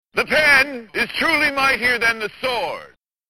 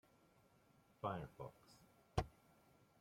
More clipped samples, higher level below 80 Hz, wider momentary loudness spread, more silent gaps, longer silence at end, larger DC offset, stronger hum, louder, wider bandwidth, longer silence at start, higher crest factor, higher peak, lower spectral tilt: neither; first, -50 dBFS vs -62 dBFS; second, 11 LU vs 21 LU; neither; second, 0.45 s vs 0.7 s; first, 0.2% vs under 0.1%; neither; first, -17 LUFS vs -49 LUFS; about the same, 17 kHz vs 16.5 kHz; second, 0.15 s vs 1.05 s; second, 20 dB vs 28 dB; first, 0 dBFS vs -24 dBFS; second, -2.5 dB/octave vs -6.5 dB/octave